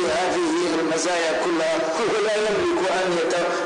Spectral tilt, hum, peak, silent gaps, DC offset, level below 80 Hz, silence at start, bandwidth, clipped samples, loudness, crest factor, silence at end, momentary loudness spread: -3 dB/octave; none; -14 dBFS; none; under 0.1%; -58 dBFS; 0 s; 10 kHz; under 0.1%; -22 LUFS; 8 dB; 0 s; 1 LU